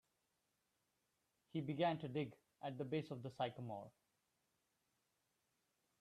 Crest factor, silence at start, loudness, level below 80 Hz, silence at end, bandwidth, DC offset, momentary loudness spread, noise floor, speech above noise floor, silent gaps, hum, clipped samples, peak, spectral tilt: 22 dB; 1.55 s; -46 LUFS; -86 dBFS; 2.1 s; 13.5 kHz; under 0.1%; 11 LU; -86 dBFS; 42 dB; none; none; under 0.1%; -26 dBFS; -7.5 dB/octave